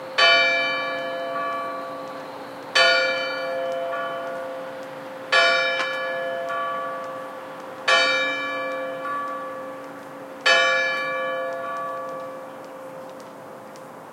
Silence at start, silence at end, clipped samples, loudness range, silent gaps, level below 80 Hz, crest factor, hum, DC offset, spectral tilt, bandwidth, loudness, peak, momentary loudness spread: 0 s; 0 s; under 0.1%; 3 LU; none; -84 dBFS; 20 dB; none; under 0.1%; -1.5 dB/octave; 16.5 kHz; -22 LUFS; -4 dBFS; 21 LU